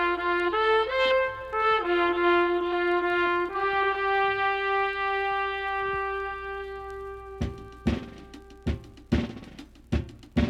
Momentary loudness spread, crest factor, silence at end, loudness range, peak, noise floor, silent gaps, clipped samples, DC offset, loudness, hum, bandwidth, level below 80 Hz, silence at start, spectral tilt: 14 LU; 16 dB; 0 s; 9 LU; -10 dBFS; -46 dBFS; none; under 0.1%; under 0.1%; -26 LUFS; none; 8.6 kHz; -42 dBFS; 0 s; -6.5 dB/octave